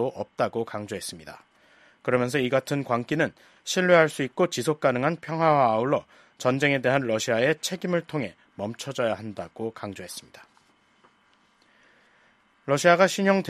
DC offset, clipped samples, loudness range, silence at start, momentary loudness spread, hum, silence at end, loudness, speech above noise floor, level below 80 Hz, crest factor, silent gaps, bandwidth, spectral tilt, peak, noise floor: under 0.1%; under 0.1%; 12 LU; 0 s; 16 LU; none; 0 s; -25 LUFS; 38 dB; -68 dBFS; 22 dB; none; 14 kHz; -5 dB/octave; -4 dBFS; -63 dBFS